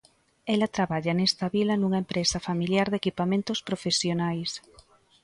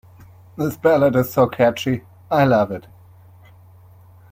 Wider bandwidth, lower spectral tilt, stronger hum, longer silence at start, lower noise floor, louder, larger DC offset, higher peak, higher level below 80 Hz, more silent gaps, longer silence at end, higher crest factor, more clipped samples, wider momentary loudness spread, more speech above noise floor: second, 11.5 kHz vs 16.5 kHz; second, -4.5 dB/octave vs -7 dB/octave; neither; about the same, 0.45 s vs 0.55 s; first, -57 dBFS vs -46 dBFS; second, -26 LUFS vs -18 LUFS; neither; second, -10 dBFS vs -2 dBFS; about the same, -58 dBFS vs -54 dBFS; neither; second, 0.65 s vs 1.5 s; about the same, 16 dB vs 18 dB; neither; second, 5 LU vs 11 LU; about the same, 31 dB vs 29 dB